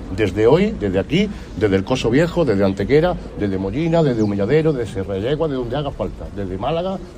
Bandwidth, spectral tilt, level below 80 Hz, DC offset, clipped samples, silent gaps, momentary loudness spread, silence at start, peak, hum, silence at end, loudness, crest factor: 10.5 kHz; -7 dB/octave; -36 dBFS; under 0.1%; under 0.1%; none; 8 LU; 0 s; -2 dBFS; none; 0 s; -19 LUFS; 16 dB